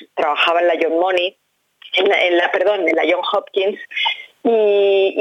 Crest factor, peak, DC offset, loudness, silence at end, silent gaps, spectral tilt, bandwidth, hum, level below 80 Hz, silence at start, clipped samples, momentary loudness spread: 14 dB; -4 dBFS; under 0.1%; -16 LUFS; 0 s; none; -3.5 dB/octave; 8.2 kHz; none; -74 dBFS; 0 s; under 0.1%; 6 LU